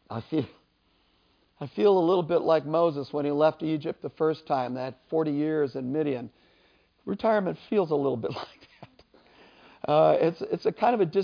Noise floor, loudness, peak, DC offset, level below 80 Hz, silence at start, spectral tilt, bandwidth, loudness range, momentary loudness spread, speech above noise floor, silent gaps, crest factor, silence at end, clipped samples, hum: -68 dBFS; -26 LUFS; -8 dBFS; under 0.1%; -68 dBFS; 0.1 s; -8.5 dB/octave; 5.2 kHz; 5 LU; 13 LU; 42 dB; none; 18 dB; 0 s; under 0.1%; none